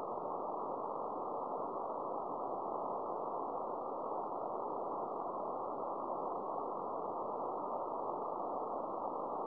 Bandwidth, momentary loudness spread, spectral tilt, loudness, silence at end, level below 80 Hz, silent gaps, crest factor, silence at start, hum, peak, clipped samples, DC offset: 5.4 kHz; 1 LU; -9 dB/octave; -41 LUFS; 0 s; -78 dBFS; none; 14 dB; 0 s; none; -26 dBFS; under 0.1%; under 0.1%